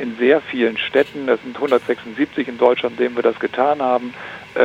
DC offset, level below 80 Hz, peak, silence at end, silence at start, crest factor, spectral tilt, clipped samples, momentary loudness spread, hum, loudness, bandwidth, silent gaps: under 0.1%; -62 dBFS; 0 dBFS; 0 s; 0 s; 18 dB; -6 dB/octave; under 0.1%; 6 LU; none; -19 LUFS; 8.6 kHz; none